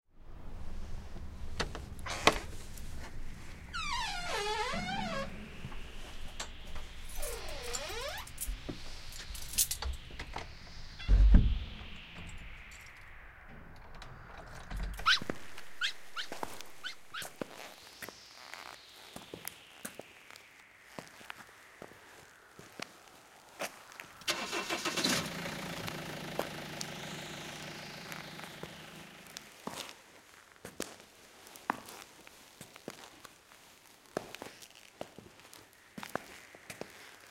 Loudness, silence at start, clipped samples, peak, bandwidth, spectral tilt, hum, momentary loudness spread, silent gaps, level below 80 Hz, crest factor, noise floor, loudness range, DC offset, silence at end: -38 LUFS; 0.15 s; under 0.1%; -4 dBFS; 16.5 kHz; -3 dB/octave; none; 22 LU; none; -40 dBFS; 34 dB; -59 dBFS; 14 LU; under 0.1%; 0 s